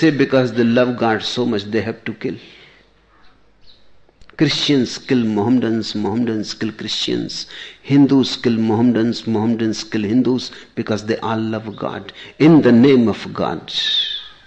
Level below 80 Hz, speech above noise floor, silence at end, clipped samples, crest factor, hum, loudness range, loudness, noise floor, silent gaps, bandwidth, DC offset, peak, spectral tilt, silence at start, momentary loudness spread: -54 dBFS; 35 dB; 0.15 s; under 0.1%; 16 dB; none; 7 LU; -17 LUFS; -51 dBFS; none; 8.4 kHz; under 0.1%; -2 dBFS; -6 dB/octave; 0 s; 14 LU